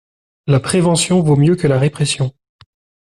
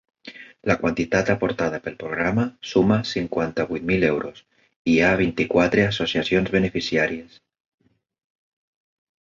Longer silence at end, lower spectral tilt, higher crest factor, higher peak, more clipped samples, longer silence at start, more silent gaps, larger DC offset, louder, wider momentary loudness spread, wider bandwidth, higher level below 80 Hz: second, 0.9 s vs 1.95 s; about the same, -5.5 dB/octave vs -6 dB/octave; second, 12 dB vs 18 dB; about the same, -4 dBFS vs -4 dBFS; neither; first, 0.45 s vs 0.25 s; second, none vs 4.76-4.85 s; neither; first, -15 LUFS vs -22 LUFS; second, 7 LU vs 11 LU; first, 12 kHz vs 7.4 kHz; about the same, -48 dBFS vs -48 dBFS